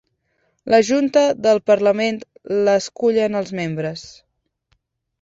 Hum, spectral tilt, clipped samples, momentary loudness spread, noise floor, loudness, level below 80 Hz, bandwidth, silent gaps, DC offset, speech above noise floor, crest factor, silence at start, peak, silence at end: none; -5 dB/octave; under 0.1%; 12 LU; -67 dBFS; -18 LUFS; -62 dBFS; 8 kHz; none; under 0.1%; 50 dB; 18 dB; 0.65 s; -2 dBFS; 1.1 s